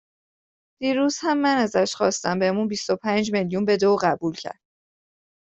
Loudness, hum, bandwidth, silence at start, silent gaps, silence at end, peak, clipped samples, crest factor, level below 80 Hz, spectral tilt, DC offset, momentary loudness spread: -22 LUFS; none; 8.2 kHz; 0.8 s; none; 1 s; -6 dBFS; under 0.1%; 18 dB; -64 dBFS; -4.5 dB/octave; under 0.1%; 8 LU